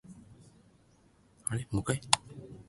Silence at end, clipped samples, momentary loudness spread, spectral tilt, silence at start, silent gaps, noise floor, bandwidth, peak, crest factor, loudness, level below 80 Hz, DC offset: 0.05 s; under 0.1%; 24 LU; -3 dB/octave; 0.1 s; none; -64 dBFS; 12 kHz; -2 dBFS; 34 dB; -32 LUFS; -56 dBFS; under 0.1%